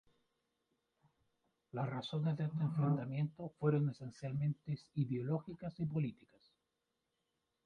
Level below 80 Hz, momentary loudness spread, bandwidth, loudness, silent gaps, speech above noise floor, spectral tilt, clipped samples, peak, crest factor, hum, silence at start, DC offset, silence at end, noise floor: -74 dBFS; 8 LU; 6.8 kHz; -39 LUFS; none; 49 dB; -9 dB/octave; under 0.1%; -20 dBFS; 20 dB; none; 1.75 s; under 0.1%; 1.55 s; -87 dBFS